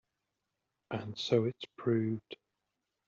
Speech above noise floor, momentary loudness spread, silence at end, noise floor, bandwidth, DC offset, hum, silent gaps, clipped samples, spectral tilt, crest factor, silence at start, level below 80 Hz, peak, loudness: 52 dB; 14 LU; 0.75 s; -86 dBFS; 7.6 kHz; under 0.1%; none; none; under 0.1%; -6 dB/octave; 22 dB; 0.9 s; -76 dBFS; -16 dBFS; -35 LUFS